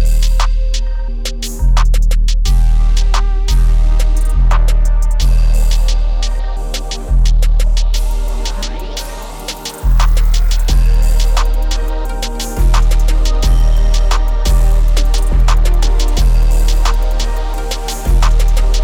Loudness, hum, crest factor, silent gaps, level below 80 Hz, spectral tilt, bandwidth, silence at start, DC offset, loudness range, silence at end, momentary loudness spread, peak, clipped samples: -16 LUFS; none; 10 dB; none; -10 dBFS; -4.5 dB/octave; 14 kHz; 0 s; under 0.1%; 3 LU; 0 s; 8 LU; 0 dBFS; under 0.1%